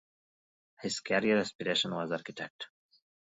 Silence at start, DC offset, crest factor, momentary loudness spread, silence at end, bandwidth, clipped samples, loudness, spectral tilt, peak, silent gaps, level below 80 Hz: 0.8 s; under 0.1%; 20 dB; 14 LU; 0.6 s; 7.8 kHz; under 0.1%; -32 LUFS; -3.5 dB/octave; -14 dBFS; 1.55-1.59 s, 2.50-2.59 s; -74 dBFS